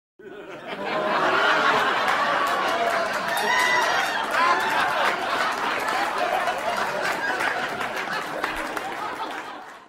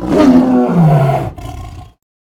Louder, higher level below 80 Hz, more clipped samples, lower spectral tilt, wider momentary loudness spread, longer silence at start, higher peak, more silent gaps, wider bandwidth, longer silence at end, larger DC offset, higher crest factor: second, -23 LUFS vs -10 LUFS; second, -60 dBFS vs -34 dBFS; second, under 0.1% vs 0.2%; second, -2 dB/octave vs -8.5 dB/octave; second, 11 LU vs 20 LU; first, 0.2 s vs 0 s; second, -8 dBFS vs 0 dBFS; neither; first, 16 kHz vs 13.5 kHz; second, 0.05 s vs 0.35 s; neither; about the same, 16 dB vs 12 dB